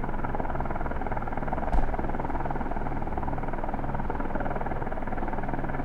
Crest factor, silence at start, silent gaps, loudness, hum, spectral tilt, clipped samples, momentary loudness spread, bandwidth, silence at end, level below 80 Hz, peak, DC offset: 16 dB; 0 s; none; -32 LUFS; none; -9 dB/octave; under 0.1%; 3 LU; 3.7 kHz; 0 s; -30 dBFS; -10 dBFS; under 0.1%